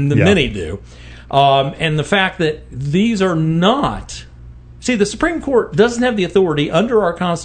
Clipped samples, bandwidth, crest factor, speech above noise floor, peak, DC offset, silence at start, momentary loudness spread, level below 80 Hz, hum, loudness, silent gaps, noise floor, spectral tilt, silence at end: under 0.1%; 9.4 kHz; 16 dB; 22 dB; 0 dBFS; under 0.1%; 0 s; 12 LU; -38 dBFS; none; -15 LUFS; none; -37 dBFS; -5.5 dB/octave; 0 s